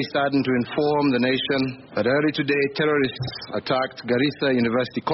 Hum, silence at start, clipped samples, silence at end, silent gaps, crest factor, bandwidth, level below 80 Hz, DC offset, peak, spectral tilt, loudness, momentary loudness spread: none; 0 s; under 0.1%; 0 s; none; 12 dB; 6 kHz; -58 dBFS; under 0.1%; -10 dBFS; -4 dB/octave; -22 LUFS; 5 LU